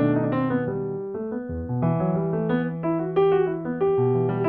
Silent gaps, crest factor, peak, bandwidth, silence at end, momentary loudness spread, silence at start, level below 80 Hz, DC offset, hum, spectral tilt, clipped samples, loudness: none; 14 dB; -10 dBFS; 4.1 kHz; 0 s; 9 LU; 0 s; -50 dBFS; under 0.1%; none; -12 dB/octave; under 0.1%; -24 LUFS